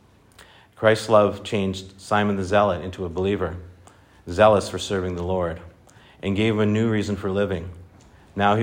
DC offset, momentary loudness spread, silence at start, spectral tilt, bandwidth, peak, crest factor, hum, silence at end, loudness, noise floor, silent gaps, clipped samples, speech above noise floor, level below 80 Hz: under 0.1%; 14 LU; 0.8 s; -6 dB/octave; 16 kHz; -2 dBFS; 20 dB; none; 0 s; -22 LUFS; -51 dBFS; none; under 0.1%; 30 dB; -54 dBFS